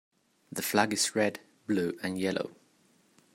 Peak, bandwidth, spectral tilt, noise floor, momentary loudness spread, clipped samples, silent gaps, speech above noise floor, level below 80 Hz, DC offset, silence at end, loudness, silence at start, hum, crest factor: -8 dBFS; 16 kHz; -3.5 dB/octave; -66 dBFS; 13 LU; under 0.1%; none; 36 dB; -76 dBFS; under 0.1%; 0.8 s; -30 LUFS; 0.5 s; none; 24 dB